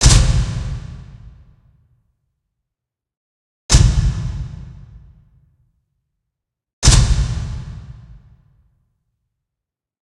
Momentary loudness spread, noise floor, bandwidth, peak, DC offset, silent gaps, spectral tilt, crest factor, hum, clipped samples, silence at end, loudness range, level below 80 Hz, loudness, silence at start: 25 LU; -85 dBFS; 12.5 kHz; 0 dBFS; under 0.1%; 3.17-3.69 s, 6.73-6.82 s; -3.5 dB/octave; 20 dB; none; under 0.1%; 2.15 s; 4 LU; -22 dBFS; -17 LUFS; 0 s